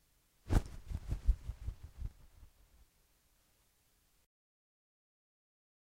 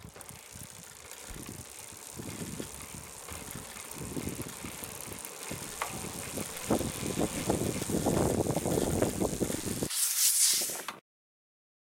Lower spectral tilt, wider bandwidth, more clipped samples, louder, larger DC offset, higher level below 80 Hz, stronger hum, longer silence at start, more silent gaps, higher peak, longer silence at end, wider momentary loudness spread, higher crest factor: first, -7 dB/octave vs -3.5 dB/octave; second, 15 kHz vs 17 kHz; neither; second, -41 LUFS vs -32 LUFS; neither; first, -42 dBFS vs -52 dBFS; neither; first, 0.45 s vs 0 s; neither; second, -18 dBFS vs -12 dBFS; first, 3.5 s vs 0.9 s; second, 13 LU vs 18 LU; about the same, 24 dB vs 22 dB